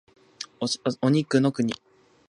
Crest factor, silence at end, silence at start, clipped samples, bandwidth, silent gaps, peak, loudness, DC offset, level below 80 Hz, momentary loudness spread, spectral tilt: 18 dB; 0.55 s; 0.4 s; under 0.1%; 11 kHz; none; -8 dBFS; -25 LUFS; under 0.1%; -70 dBFS; 17 LU; -5.5 dB/octave